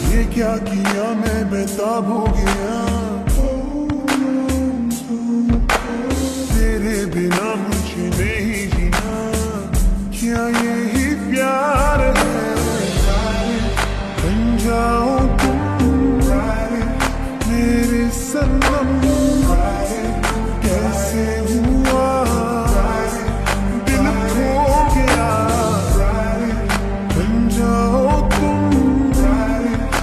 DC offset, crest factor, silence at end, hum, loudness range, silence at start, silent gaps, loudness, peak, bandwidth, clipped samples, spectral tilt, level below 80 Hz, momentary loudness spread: under 0.1%; 14 dB; 0 s; none; 3 LU; 0 s; none; -18 LUFS; -4 dBFS; 14 kHz; under 0.1%; -5.5 dB/octave; -22 dBFS; 5 LU